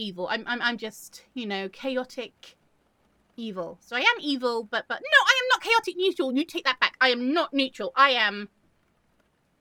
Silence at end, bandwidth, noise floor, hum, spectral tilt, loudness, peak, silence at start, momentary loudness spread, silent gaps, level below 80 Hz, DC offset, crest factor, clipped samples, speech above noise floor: 1.15 s; 18.5 kHz; -68 dBFS; none; -2.5 dB/octave; -24 LUFS; -2 dBFS; 0 s; 18 LU; none; -74 dBFS; under 0.1%; 24 dB; under 0.1%; 42 dB